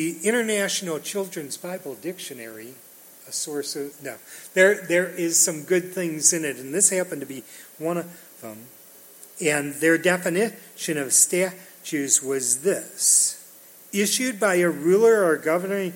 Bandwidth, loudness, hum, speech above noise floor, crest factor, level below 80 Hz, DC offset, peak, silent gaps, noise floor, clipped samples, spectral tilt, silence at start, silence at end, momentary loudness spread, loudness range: 17 kHz; -22 LUFS; none; 24 dB; 22 dB; -78 dBFS; under 0.1%; -2 dBFS; none; -48 dBFS; under 0.1%; -2.5 dB/octave; 0 s; 0 s; 20 LU; 8 LU